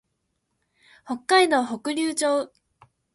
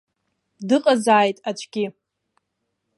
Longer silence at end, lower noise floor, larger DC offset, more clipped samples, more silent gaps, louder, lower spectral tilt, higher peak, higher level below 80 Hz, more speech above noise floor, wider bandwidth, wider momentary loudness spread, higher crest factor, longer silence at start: second, 0.7 s vs 1.05 s; about the same, -76 dBFS vs -77 dBFS; neither; neither; neither; about the same, -22 LUFS vs -20 LUFS; second, -2 dB/octave vs -4.5 dB/octave; second, -6 dBFS vs -2 dBFS; about the same, -72 dBFS vs -76 dBFS; second, 53 dB vs 57 dB; about the same, 12 kHz vs 11.5 kHz; about the same, 15 LU vs 13 LU; about the same, 18 dB vs 20 dB; first, 1.05 s vs 0.6 s